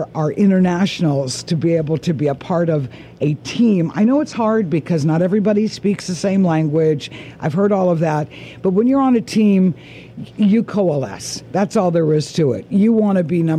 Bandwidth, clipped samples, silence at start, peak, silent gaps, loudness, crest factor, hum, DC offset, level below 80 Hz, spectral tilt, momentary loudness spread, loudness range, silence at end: 11.5 kHz; under 0.1%; 0 s; -6 dBFS; none; -17 LUFS; 10 dB; none; under 0.1%; -54 dBFS; -7 dB/octave; 8 LU; 1 LU; 0 s